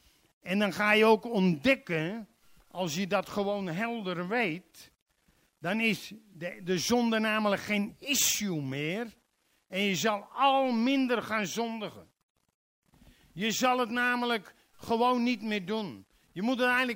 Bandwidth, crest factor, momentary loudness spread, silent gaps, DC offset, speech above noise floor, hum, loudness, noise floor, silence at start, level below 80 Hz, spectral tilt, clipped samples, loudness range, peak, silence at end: 16 kHz; 20 dB; 14 LU; 5.02-5.06 s, 12.23-12.35 s, 12.54-12.82 s; under 0.1%; 44 dB; none; -29 LUFS; -73 dBFS; 0.45 s; -68 dBFS; -4 dB/octave; under 0.1%; 5 LU; -10 dBFS; 0 s